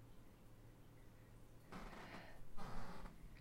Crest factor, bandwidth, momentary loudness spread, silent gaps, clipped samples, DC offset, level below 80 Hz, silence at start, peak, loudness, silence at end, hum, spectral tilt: 16 dB; 16 kHz; 11 LU; none; under 0.1%; under 0.1%; -60 dBFS; 0 s; -34 dBFS; -59 LUFS; 0 s; none; -5.5 dB/octave